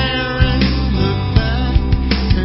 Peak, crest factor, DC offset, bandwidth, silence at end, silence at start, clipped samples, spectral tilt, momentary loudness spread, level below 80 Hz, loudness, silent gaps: 0 dBFS; 14 dB; under 0.1%; 5.8 kHz; 0 s; 0 s; under 0.1%; -10 dB/octave; 2 LU; -18 dBFS; -16 LUFS; none